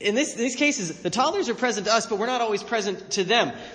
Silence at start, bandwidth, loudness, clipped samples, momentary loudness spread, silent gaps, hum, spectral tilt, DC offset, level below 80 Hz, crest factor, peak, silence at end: 0 s; 10 kHz; -24 LUFS; under 0.1%; 5 LU; none; none; -2.5 dB/octave; under 0.1%; -66 dBFS; 18 dB; -6 dBFS; 0 s